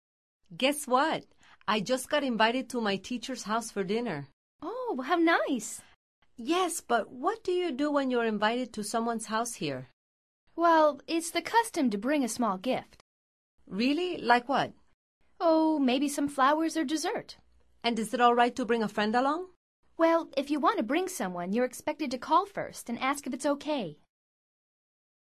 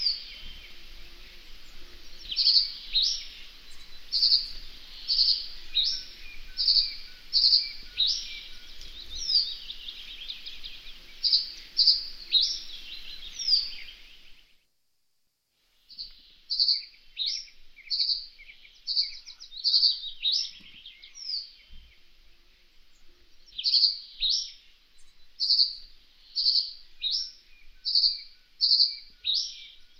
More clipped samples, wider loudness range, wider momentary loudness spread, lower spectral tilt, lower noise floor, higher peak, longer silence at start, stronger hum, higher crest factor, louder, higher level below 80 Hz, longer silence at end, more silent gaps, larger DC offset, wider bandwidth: neither; second, 3 LU vs 7 LU; second, 11 LU vs 22 LU; first, -3.5 dB/octave vs 1.5 dB/octave; first, under -90 dBFS vs -78 dBFS; about the same, -8 dBFS vs -8 dBFS; first, 0.5 s vs 0 s; neither; about the same, 22 dB vs 22 dB; second, -29 LUFS vs -25 LUFS; second, -70 dBFS vs -52 dBFS; first, 1.4 s vs 0.15 s; first, 4.33-4.59 s, 5.96-6.22 s, 9.93-10.47 s, 13.01-13.58 s, 14.94-15.21 s, 19.56-19.83 s vs none; neither; second, 13.5 kHz vs 16 kHz